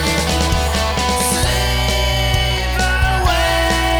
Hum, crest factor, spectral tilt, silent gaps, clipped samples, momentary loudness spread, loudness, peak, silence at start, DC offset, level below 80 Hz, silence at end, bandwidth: none; 14 dB; -3.5 dB/octave; none; under 0.1%; 2 LU; -16 LUFS; -2 dBFS; 0 s; under 0.1%; -20 dBFS; 0 s; over 20 kHz